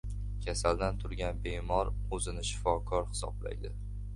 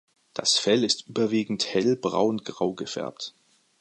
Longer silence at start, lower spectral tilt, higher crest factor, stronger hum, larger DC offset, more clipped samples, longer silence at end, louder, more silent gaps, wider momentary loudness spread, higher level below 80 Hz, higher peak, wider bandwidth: second, 0.05 s vs 0.35 s; about the same, -4.5 dB/octave vs -3.5 dB/octave; about the same, 20 dB vs 18 dB; first, 50 Hz at -40 dBFS vs none; neither; neither; second, 0 s vs 0.5 s; second, -35 LUFS vs -25 LUFS; neither; second, 9 LU vs 13 LU; first, -38 dBFS vs -68 dBFS; second, -14 dBFS vs -8 dBFS; about the same, 11.5 kHz vs 11 kHz